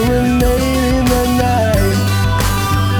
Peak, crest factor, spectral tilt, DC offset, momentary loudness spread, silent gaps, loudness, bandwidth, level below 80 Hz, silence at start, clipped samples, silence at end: -2 dBFS; 12 dB; -5.5 dB/octave; under 0.1%; 1 LU; none; -14 LUFS; over 20 kHz; -22 dBFS; 0 s; under 0.1%; 0 s